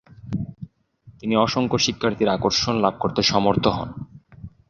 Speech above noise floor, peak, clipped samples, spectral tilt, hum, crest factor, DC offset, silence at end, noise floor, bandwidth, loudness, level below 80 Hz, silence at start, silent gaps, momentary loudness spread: 30 dB; -2 dBFS; under 0.1%; -4.5 dB/octave; none; 20 dB; under 0.1%; 0.2 s; -51 dBFS; 7.4 kHz; -21 LUFS; -46 dBFS; 0.25 s; none; 17 LU